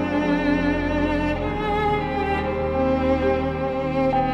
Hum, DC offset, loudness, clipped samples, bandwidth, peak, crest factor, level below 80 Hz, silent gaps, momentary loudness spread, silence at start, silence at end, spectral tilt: none; under 0.1%; -22 LUFS; under 0.1%; 8.8 kHz; -8 dBFS; 14 dB; -34 dBFS; none; 3 LU; 0 s; 0 s; -7.5 dB/octave